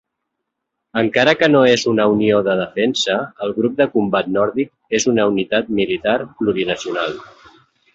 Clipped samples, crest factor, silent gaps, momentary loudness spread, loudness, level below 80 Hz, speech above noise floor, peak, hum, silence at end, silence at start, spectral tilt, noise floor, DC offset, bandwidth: under 0.1%; 16 dB; none; 9 LU; -17 LUFS; -54 dBFS; 61 dB; -2 dBFS; none; 0.7 s; 0.95 s; -4.5 dB/octave; -78 dBFS; under 0.1%; 8 kHz